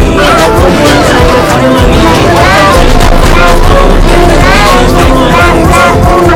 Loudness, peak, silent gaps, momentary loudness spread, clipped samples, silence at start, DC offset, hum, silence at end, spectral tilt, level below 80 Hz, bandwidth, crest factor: -4 LUFS; 0 dBFS; none; 2 LU; 10%; 0 s; under 0.1%; none; 0 s; -5 dB/octave; -8 dBFS; 17 kHz; 4 dB